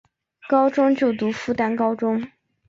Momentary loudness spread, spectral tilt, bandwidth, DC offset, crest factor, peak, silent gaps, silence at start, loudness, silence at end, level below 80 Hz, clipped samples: 7 LU; -6.5 dB/octave; 7.6 kHz; under 0.1%; 16 dB; -6 dBFS; none; 0.45 s; -21 LUFS; 0.4 s; -62 dBFS; under 0.1%